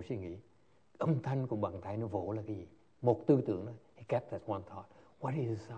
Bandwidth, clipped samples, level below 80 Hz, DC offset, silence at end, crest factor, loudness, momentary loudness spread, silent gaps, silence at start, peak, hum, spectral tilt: 8.6 kHz; under 0.1%; -72 dBFS; under 0.1%; 0 s; 22 dB; -36 LUFS; 17 LU; none; 0 s; -14 dBFS; none; -9.5 dB/octave